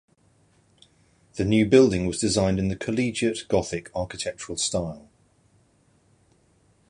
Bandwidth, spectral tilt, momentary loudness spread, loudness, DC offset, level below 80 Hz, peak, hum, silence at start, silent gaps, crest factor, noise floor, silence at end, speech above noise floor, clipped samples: 11.5 kHz; -5 dB/octave; 14 LU; -24 LUFS; under 0.1%; -48 dBFS; -4 dBFS; none; 1.35 s; none; 22 dB; -62 dBFS; 1.9 s; 39 dB; under 0.1%